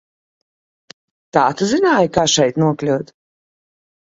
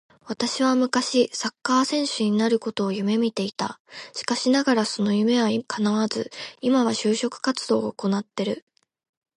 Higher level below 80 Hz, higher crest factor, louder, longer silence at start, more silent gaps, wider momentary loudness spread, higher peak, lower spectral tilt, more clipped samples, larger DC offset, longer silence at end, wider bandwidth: first, -52 dBFS vs -70 dBFS; about the same, 18 dB vs 18 dB; first, -16 LUFS vs -23 LUFS; first, 1.35 s vs 0.25 s; second, none vs 3.79-3.85 s; about the same, 7 LU vs 9 LU; first, 0 dBFS vs -6 dBFS; about the same, -4 dB/octave vs -4.5 dB/octave; neither; neither; first, 1.1 s vs 0.8 s; second, 8 kHz vs 11.5 kHz